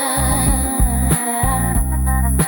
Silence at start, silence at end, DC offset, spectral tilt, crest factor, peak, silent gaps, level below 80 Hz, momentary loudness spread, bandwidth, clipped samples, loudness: 0 s; 0 s; under 0.1%; -4.5 dB/octave; 16 dB; 0 dBFS; none; -20 dBFS; 3 LU; 19 kHz; under 0.1%; -17 LUFS